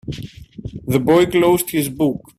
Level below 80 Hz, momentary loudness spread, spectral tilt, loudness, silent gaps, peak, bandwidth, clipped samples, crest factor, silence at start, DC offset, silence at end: -44 dBFS; 19 LU; -5.5 dB/octave; -16 LUFS; none; -2 dBFS; 16 kHz; under 0.1%; 16 dB; 0.05 s; under 0.1%; 0.2 s